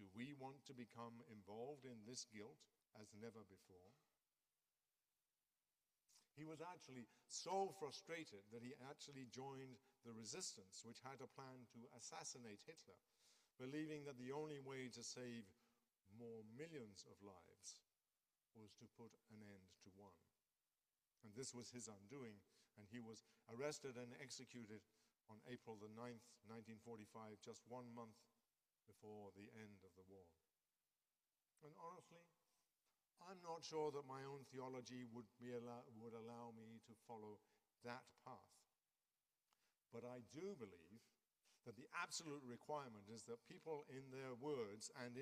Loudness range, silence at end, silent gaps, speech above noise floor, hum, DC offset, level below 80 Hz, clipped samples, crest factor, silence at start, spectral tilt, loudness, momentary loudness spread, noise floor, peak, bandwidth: 12 LU; 0 s; none; over 33 dB; none; under 0.1%; under -90 dBFS; under 0.1%; 24 dB; 0 s; -4 dB/octave; -57 LUFS; 15 LU; under -90 dBFS; -34 dBFS; 15 kHz